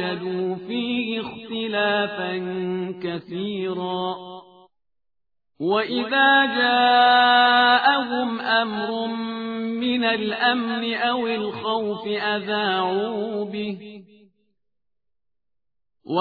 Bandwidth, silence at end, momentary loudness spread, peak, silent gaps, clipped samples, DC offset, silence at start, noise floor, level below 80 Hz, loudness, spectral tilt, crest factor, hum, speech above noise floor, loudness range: 4.9 kHz; 0 s; 14 LU; -4 dBFS; none; under 0.1%; under 0.1%; 0 s; -84 dBFS; -68 dBFS; -21 LUFS; -7 dB/octave; 18 dB; none; 62 dB; 11 LU